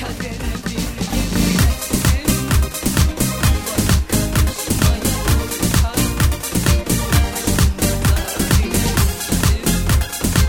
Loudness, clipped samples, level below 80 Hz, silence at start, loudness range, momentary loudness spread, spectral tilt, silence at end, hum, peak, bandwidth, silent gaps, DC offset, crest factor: -18 LUFS; under 0.1%; -22 dBFS; 0 s; 1 LU; 3 LU; -4.5 dB/octave; 0 s; none; -2 dBFS; over 20 kHz; none; under 0.1%; 16 dB